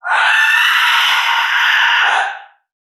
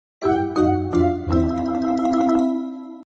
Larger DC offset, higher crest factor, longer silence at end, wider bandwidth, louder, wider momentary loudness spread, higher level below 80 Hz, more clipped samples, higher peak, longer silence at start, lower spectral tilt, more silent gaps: neither; about the same, 12 dB vs 14 dB; first, 0.4 s vs 0.15 s; first, 14 kHz vs 8 kHz; first, -11 LUFS vs -20 LUFS; about the same, 4 LU vs 6 LU; second, under -90 dBFS vs -38 dBFS; neither; first, -2 dBFS vs -8 dBFS; second, 0.05 s vs 0.2 s; second, 5.5 dB/octave vs -8 dB/octave; neither